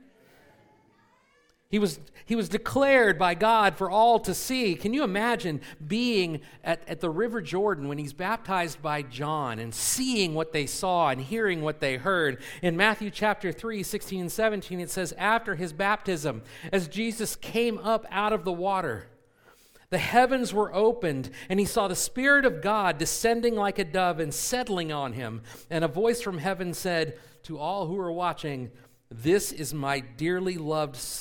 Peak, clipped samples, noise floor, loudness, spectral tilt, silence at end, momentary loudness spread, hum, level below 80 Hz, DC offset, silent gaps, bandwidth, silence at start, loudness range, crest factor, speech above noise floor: -4 dBFS; under 0.1%; -65 dBFS; -27 LUFS; -4 dB/octave; 0 s; 10 LU; none; -54 dBFS; under 0.1%; none; 19 kHz; 1.7 s; 6 LU; 22 dB; 38 dB